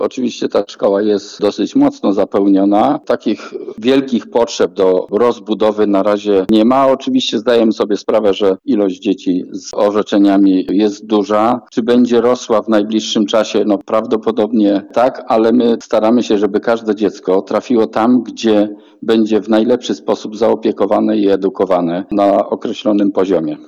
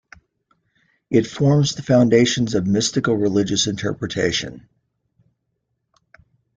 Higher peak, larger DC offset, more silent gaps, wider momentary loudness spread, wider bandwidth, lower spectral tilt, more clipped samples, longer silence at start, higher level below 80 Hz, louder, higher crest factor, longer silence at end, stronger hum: about the same, -2 dBFS vs -2 dBFS; neither; neither; about the same, 6 LU vs 8 LU; second, 8.2 kHz vs 9.4 kHz; about the same, -5.5 dB/octave vs -5 dB/octave; neither; second, 0 s vs 1.1 s; about the same, -56 dBFS vs -52 dBFS; first, -14 LUFS vs -19 LUFS; second, 12 dB vs 18 dB; second, 0.05 s vs 2 s; neither